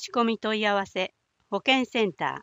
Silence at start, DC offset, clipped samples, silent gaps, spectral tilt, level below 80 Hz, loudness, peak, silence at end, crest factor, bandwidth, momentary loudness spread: 0 s; under 0.1%; under 0.1%; none; -4 dB/octave; -70 dBFS; -26 LUFS; -6 dBFS; 0 s; 20 dB; 15.5 kHz; 9 LU